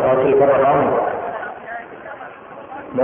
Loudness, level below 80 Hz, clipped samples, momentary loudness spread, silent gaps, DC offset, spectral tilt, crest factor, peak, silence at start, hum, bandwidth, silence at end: -17 LUFS; -52 dBFS; under 0.1%; 21 LU; none; under 0.1%; -11.5 dB/octave; 14 dB; -4 dBFS; 0 s; none; 3.6 kHz; 0 s